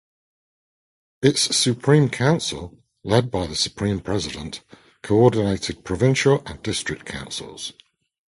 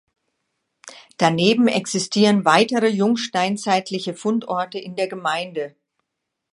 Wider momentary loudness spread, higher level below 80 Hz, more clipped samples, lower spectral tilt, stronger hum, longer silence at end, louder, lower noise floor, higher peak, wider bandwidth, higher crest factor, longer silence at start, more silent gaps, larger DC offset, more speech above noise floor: first, 16 LU vs 11 LU; first, -46 dBFS vs -70 dBFS; neither; about the same, -4.5 dB/octave vs -4.5 dB/octave; neither; second, 0.6 s vs 0.85 s; about the same, -21 LUFS vs -20 LUFS; first, under -90 dBFS vs -80 dBFS; about the same, 0 dBFS vs 0 dBFS; about the same, 12 kHz vs 11.5 kHz; about the same, 22 dB vs 20 dB; first, 1.2 s vs 0.85 s; neither; neither; first, over 69 dB vs 60 dB